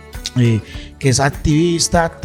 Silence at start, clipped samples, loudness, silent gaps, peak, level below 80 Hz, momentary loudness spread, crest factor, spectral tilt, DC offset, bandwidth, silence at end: 0.05 s; under 0.1%; -16 LUFS; none; -2 dBFS; -32 dBFS; 8 LU; 14 dB; -5 dB/octave; under 0.1%; 16.5 kHz; 0 s